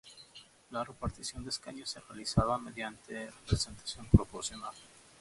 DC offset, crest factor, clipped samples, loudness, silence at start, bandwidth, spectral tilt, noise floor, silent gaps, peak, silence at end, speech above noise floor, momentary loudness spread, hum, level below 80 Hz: under 0.1%; 28 dB; under 0.1%; -35 LUFS; 0.05 s; 11.5 kHz; -5 dB/octave; -57 dBFS; none; -8 dBFS; 0.35 s; 23 dB; 19 LU; none; -44 dBFS